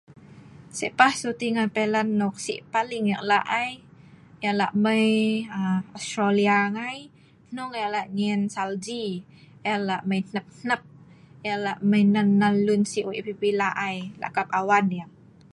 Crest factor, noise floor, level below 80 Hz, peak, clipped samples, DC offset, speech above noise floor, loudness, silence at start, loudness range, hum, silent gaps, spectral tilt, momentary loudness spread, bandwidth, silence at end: 22 dB; -50 dBFS; -68 dBFS; -2 dBFS; under 0.1%; under 0.1%; 26 dB; -25 LUFS; 0.1 s; 5 LU; none; none; -5.5 dB/octave; 12 LU; 11.5 kHz; 0.5 s